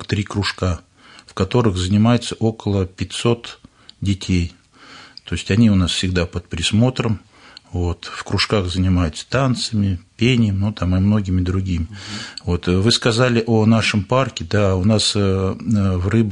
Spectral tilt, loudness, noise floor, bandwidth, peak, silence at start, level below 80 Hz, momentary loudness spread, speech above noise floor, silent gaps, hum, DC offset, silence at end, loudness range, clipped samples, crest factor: -5.5 dB/octave; -19 LUFS; -43 dBFS; 10.5 kHz; -2 dBFS; 0 s; -44 dBFS; 11 LU; 25 dB; none; none; under 0.1%; 0 s; 4 LU; under 0.1%; 16 dB